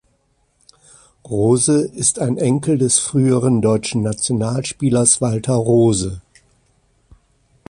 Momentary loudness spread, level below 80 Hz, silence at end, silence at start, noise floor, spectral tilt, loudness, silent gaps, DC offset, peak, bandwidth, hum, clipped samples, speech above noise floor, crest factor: 7 LU; -46 dBFS; 1.5 s; 1.25 s; -62 dBFS; -5 dB/octave; -16 LUFS; none; under 0.1%; 0 dBFS; 11.5 kHz; none; under 0.1%; 46 dB; 18 dB